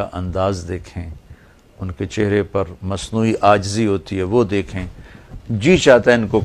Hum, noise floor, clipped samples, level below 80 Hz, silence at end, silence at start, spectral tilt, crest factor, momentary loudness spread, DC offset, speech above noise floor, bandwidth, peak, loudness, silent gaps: none; -44 dBFS; under 0.1%; -40 dBFS; 0 s; 0 s; -6 dB/octave; 18 dB; 19 LU; under 0.1%; 27 dB; 12 kHz; 0 dBFS; -17 LUFS; none